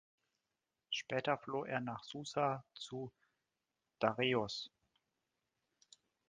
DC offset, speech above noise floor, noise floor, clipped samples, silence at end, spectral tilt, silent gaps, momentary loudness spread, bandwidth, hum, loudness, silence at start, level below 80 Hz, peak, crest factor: under 0.1%; 50 dB; -90 dBFS; under 0.1%; 1.65 s; -4.5 dB/octave; none; 12 LU; 9.6 kHz; none; -40 LUFS; 0.9 s; -80 dBFS; -16 dBFS; 26 dB